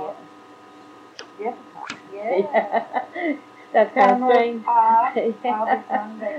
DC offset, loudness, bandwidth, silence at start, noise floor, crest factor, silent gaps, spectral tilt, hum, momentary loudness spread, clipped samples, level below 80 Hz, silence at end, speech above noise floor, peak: under 0.1%; -21 LUFS; 8.6 kHz; 0 s; -45 dBFS; 18 dB; none; -5.5 dB/octave; none; 19 LU; under 0.1%; -82 dBFS; 0 s; 25 dB; -4 dBFS